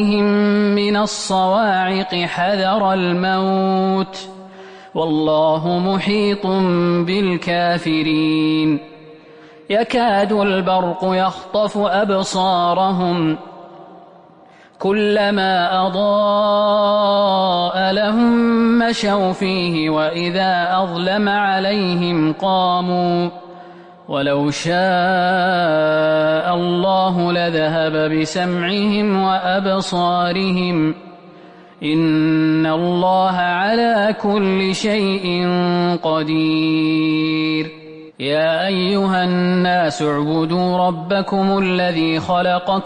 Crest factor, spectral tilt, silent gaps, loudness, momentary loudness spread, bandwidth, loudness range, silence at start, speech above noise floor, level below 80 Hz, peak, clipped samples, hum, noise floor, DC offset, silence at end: 10 dB; -6 dB/octave; none; -17 LUFS; 4 LU; 10 kHz; 3 LU; 0 s; 29 dB; -54 dBFS; -6 dBFS; under 0.1%; none; -46 dBFS; under 0.1%; 0 s